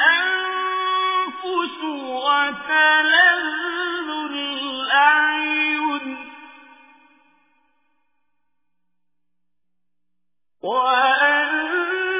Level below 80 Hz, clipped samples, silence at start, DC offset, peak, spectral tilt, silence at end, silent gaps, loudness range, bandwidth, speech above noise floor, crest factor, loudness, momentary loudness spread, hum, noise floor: -70 dBFS; under 0.1%; 0 s; under 0.1%; -4 dBFS; -4.5 dB/octave; 0 s; none; 10 LU; 3.9 kHz; 66 dB; 18 dB; -19 LUFS; 12 LU; none; -84 dBFS